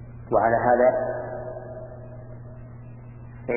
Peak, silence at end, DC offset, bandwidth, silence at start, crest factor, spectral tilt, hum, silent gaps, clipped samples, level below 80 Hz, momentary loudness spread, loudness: -8 dBFS; 0 s; under 0.1%; 2.8 kHz; 0 s; 18 dB; -14 dB/octave; none; none; under 0.1%; -48 dBFS; 23 LU; -23 LUFS